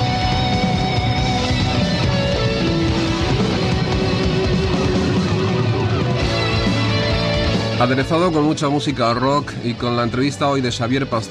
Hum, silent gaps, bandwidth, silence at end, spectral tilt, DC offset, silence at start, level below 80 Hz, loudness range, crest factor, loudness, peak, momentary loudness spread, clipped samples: none; none; 11 kHz; 0 s; -6 dB/octave; under 0.1%; 0 s; -30 dBFS; 1 LU; 12 dB; -18 LUFS; -6 dBFS; 2 LU; under 0.1%